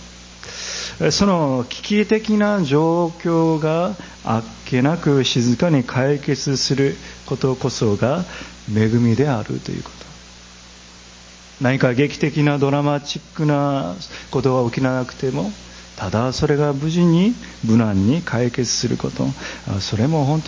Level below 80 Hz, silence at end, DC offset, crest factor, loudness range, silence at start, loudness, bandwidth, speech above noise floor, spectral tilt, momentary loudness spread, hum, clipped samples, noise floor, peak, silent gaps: -44 dBFS; 0 s; under 0.1%; 18 dB; 4 LU; 0 s; -19 LUFS; 7.8 kHz; 24 dB; -6 dB/octave; 12 LU; 60 Hz at -45 dBFS; under 0.1%; -42 dBFS; 0 dBFS; none